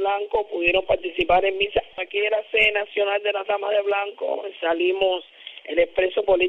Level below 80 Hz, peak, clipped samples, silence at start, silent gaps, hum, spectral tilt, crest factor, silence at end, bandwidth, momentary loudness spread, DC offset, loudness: -50 dBFS; -6 dBFS; under 0.1%; 0 s; none; none; -5.5 dB/octave; 16 dB; 0 s; 5.2 kHz; 8 LU; under 0.1%; -22 LUFS